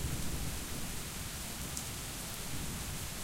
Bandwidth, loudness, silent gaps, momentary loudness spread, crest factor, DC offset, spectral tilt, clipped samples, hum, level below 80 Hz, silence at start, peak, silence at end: 17 kHz; -40 LUFS; none; 2 LU; 22 dB; under 0.1%; -3 dB/octave; under 0.1%; none; -46 dBFS; 0 s; -18 dBFS; 0 s